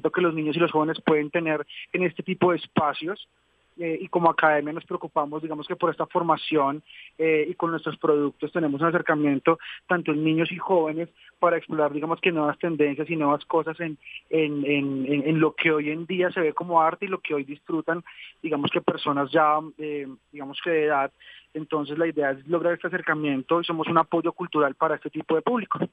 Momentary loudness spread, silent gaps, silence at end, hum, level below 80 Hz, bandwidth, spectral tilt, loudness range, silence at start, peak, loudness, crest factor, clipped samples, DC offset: 10 LU; none; 0.05 s; none; -72 dBFS; 4.9 kHz; -8.5 dB/octave; 2 LU; 0.05 s; -4 dBFS; -25 LUFS; 20 dB; under 0.1%; under 0.1%